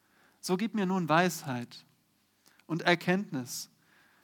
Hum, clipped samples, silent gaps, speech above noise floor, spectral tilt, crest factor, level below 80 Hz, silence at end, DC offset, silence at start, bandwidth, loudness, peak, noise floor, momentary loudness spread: none; under 0.1%; none; 41 dB; -5 dB/octave; 24 dB; -86 dBFS; 0.6 s; under 0.1%; 0.45 s; 19 kHz; -31 LUFS; -8 dBFS; -71 dBFS; 16 LU